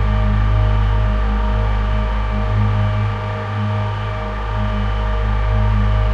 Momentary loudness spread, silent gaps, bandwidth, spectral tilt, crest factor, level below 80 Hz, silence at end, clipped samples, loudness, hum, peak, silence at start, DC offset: 5 LU; none; 5.6 kHz; -8 dB/octave; 10 dB; -18 dBFS; 0 s; under 0.1%; -19 LUFS; none; -6 dBFS; 0 s; under 0.1%